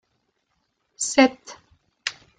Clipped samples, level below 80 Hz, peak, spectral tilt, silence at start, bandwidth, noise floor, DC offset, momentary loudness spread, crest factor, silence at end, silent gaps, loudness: under 0.1%; -66 dBFS; -2 dBFS; -1.5 dB/octave; 1 s; 9.6 kHz; -73 dBFS; under 0.1%; 15 LU; 24 dB; 0.3 s; none; -22 LUFS